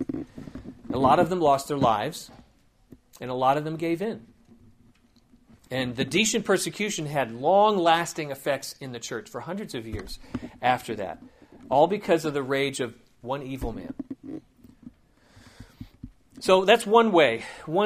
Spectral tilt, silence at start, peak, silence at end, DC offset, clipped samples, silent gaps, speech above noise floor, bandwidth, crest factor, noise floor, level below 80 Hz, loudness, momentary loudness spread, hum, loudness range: -4.5 dB/octave; 0 s; -4 dBFS; 0 s; under 0.1%; under 0.1%; none; 35 dB; 15.5 kHz; 22 dB; -60 dBFS; -52 dBFS; -25 LUFS; 20 LU; none; 8 LU